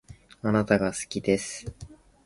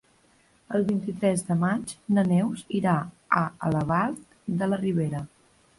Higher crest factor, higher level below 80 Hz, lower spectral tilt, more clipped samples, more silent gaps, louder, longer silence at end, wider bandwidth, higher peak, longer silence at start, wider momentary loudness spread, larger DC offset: about the same, 22 dB vs 18 dB; first, -52 dBFS vs -58 dBFS; second, -5 dB/octave vs -7 dB/octave; neither; neither; about the same, -27 LUFS vs -26 LUFS; second, 0.3 s vs 0.5 s; about the same, 11.5 kHz vs 11.5 kHz; about the same, -6 dBFS vs -8 dBFS; second, 0.1 s vs 0.7 s; first, 17 LU vs 7 LU; neither